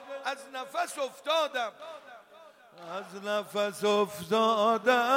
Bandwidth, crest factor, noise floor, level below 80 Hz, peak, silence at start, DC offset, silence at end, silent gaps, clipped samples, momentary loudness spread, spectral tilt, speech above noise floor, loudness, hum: 16.5 kHz; 18 dB; -55 dBFS; -80 dBFS; -12 dBFS; 0 s; under 0.1%; 0 s; none; under 0.1%; 16 LU; -3.5 dB/octave; 26 dB; -29 LUFS; none